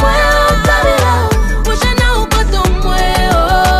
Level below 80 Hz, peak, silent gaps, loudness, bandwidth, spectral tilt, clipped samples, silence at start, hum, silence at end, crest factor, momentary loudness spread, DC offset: -14 dBFS; 0 dBFS; none; -12 LUFS; 15.5 kHz; -4.5 dB/octave; under 0.1%; 0 s; none; 0 s; 10 dB; 4 LU; under 0.1%